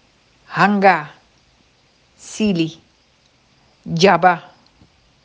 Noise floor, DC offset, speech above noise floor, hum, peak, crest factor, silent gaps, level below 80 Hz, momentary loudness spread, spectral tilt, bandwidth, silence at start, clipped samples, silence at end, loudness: -57 dBFS; under 0.1%; 42 dB; none; 0 dBFS; 20 dB; none; -58 dBFS; 19 LU; -5.5 dB/octave; 9.6 kHz; 0.5 s; under 0.1%; 0.85 s; -16 LUFS